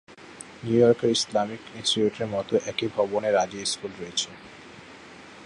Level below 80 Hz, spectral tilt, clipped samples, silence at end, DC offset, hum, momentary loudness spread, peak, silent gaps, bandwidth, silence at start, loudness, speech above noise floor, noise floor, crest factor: -62 dBFS; -4 dB/octave; under 0.1%; 0 s; under 0.1%; none; 24 LU; -6 dBFS; none; 11.5 kHz; 0.1 s; -25 LUFS; 21 dB; -46 dBFS; 20 dB